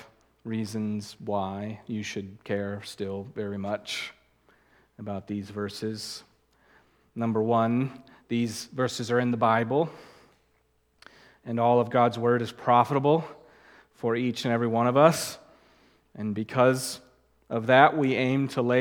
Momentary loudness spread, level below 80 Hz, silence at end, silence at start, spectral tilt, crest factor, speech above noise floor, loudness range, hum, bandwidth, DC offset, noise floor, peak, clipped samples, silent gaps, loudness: 15 LU; -70 dBFS; 0 s; 0 s; -5.5 dB/octave; 24 dB; 43 dB; 10 LU; none; 19 kHz; under 0.1%; -69 dBFS; -2 dBFS; under 0.1%; none; -27 LUFS